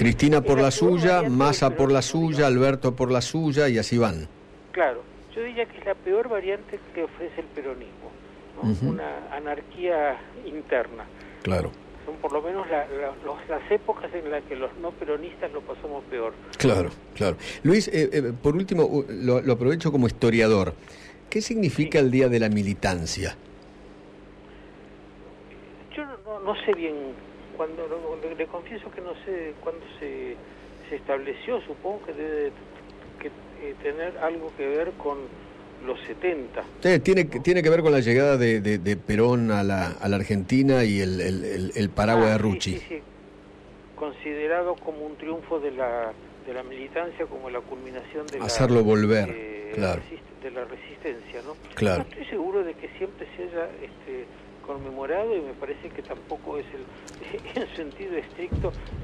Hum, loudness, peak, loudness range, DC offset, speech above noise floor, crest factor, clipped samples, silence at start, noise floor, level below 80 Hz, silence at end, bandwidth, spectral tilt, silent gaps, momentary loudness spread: 50 Hz at -55 dBFS; -25 LUFS; -10 dBFS; 11 LU; under 0.1%; 22 dB; 16 dB; under 0.1%; 0 s; -47 dBFS; -48 dBFS; 0 s; 13 kHz; -6 dB/octave; none; 18 LU